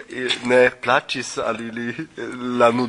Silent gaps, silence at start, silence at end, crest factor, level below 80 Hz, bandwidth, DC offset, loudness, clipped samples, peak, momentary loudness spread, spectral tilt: none; 0 s; 0 s; 18 dB; -60 dBFS; 11 kHz; under 0.1%; -21 LUFS; under 0.1%; -2 dBFS; 13 LU; -4 dB/octave